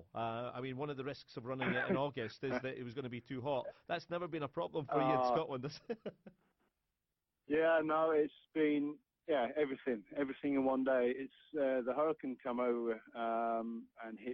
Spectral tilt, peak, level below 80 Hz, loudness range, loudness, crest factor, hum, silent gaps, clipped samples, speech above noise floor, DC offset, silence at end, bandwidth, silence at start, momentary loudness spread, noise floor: -7.5 dB/octave; -22 dBFS; -74 dBFS; 4 LU; -38 LUFS; 16 dB; none; none; under 0.1%; 52 dB; under 0.1%; 0 s; 6.2 kHz; 0 s; 12 LU; -90 dBFS